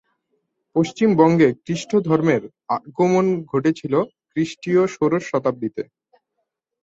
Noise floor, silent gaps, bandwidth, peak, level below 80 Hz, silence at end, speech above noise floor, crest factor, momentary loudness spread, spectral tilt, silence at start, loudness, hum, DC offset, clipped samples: -77 dBFS; none; 8 kHz; -2 dBFS; -60 dBFS; 1 s; 58 dB; 18 dB; 11 LU; -7 dB/octave; 0.75 s; -20 LUFS; none; under 0.1%; under 0.1%